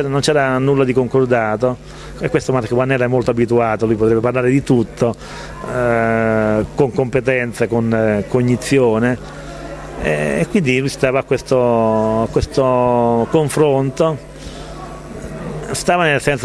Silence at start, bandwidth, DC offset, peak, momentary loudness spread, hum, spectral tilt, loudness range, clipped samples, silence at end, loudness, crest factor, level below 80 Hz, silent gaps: 0 s; 13 kHz; under 0.1%; 0 dBFS; 15 LU; none; -6 dB/octave; 2 LU; under 0.1%; 0 s; -16 LUFS; 16 dB; -38 dBFS; none